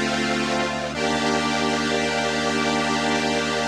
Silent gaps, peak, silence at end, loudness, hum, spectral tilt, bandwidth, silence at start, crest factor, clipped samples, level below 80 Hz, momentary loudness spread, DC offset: none; -8 dBFS; 0 s; -22 LUFS; none; -3.5 dB/octave; 13.5 kHz; 0 s; 16 dB; under 0.1%; -46 dBFS; 2 LU; under 0.1%